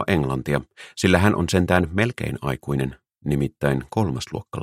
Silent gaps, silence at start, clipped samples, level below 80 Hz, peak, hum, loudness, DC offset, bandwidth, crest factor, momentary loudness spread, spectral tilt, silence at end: none; 0 s; under 0.1%; -42 dBFS; -2 dBFS; none; -23 LUFS; under 0.1%; 15.5 kHz; 22 dB; 11 LU; -6 dB/octave; 0 s